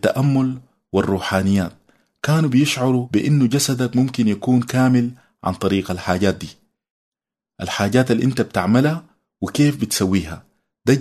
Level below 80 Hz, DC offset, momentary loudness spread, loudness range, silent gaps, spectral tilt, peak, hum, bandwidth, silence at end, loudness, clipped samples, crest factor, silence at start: -50 dBFS; under 0.1%; 11 LU; 4 LU; 6.90-7.12 s; -6 dB/octave; -2 dBFS; none; 13.5 kHz; 0 s; -19 LUFS; under 0.1%; 18 dB; 0.05 s